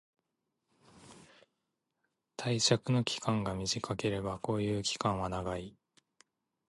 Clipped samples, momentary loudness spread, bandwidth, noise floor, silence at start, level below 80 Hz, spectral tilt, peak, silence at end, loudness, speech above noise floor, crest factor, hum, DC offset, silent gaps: under 0.1%; 11 LU; 11.5 kHz; -85 dBFS; 0.95 s; -58 dBFS; -4.5 dB/octave; -12 dBFS; 1 s; -33 LUFS; 52 dB; 24 dB; none; under 0.1%; none